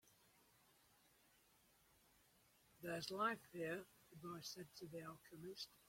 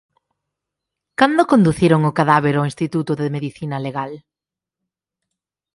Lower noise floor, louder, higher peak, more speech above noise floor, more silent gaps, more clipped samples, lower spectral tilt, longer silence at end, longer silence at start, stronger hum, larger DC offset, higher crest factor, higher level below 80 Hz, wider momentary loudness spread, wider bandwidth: second, -76 dBFS vs -88 dBFS; second, -50 LUFS vs -17 LUFS; second, -30 dBFS vs 0 dBFS; second, 26 dB vs 71 dB; neither; neither; second, -4 dB/octave vs -7 dB/octave; second, 0.05 s vs 1.55 s; first, 2.8 s vs 1.2 s; neither; neither; about the same, 24 dB vs 20 dB; second, -84 dBFS vs -52 dBFS; about the same, 14 LU vs 12 LU; first, 16.5 kHz vs 11.5 kHz